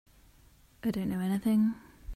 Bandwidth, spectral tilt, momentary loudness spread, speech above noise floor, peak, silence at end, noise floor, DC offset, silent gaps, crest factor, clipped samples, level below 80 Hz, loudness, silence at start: 14.5 kHz; -7.5 dB/octave; 9 LU; 31 dB; -20 dBFS; 0 s; -60 dBFS; under 0.1%; none; 14 dB; under 0.1%; -52 dBFS; -31 LUFS; 0.85 s